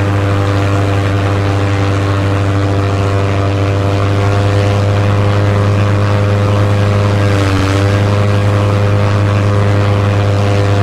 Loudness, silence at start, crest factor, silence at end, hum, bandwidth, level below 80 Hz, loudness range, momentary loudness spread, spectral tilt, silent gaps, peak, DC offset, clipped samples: -12 LUFS; 0 s; 10 dB; 0 s; none; 10 kHz; -32 dBFS; 1 LU; 2 LU; -7 dB/octave; none; 0 dBFS; 1%; under 0.1%